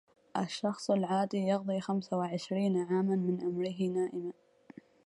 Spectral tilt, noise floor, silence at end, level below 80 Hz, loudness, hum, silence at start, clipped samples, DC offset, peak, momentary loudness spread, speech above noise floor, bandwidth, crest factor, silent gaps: -7 dB/octave; -56 dBFS; 0.75 s; -78 dBFS; -33 LUFS; none; 0.35 s; under 0.1%; under 0.1%; -16 dBFS; 6 LU; 24 dB; 11.5 kHz; 16 dB; none